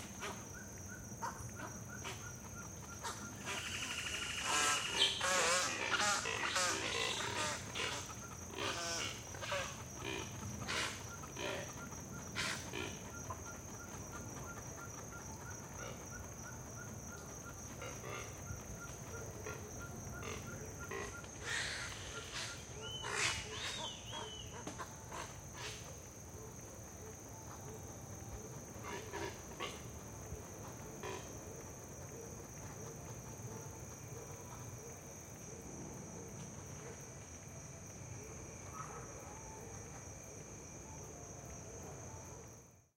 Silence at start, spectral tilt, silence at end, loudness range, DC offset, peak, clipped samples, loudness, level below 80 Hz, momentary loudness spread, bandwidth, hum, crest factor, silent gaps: 0 s; -2 dB/octave; 0.15 s; 14 LU; under 0.1%; -18 dBFS; under 0.1%; -43 LUFS; -60 dBFS; 14 LU; 17 kHz; none; 26 dB; none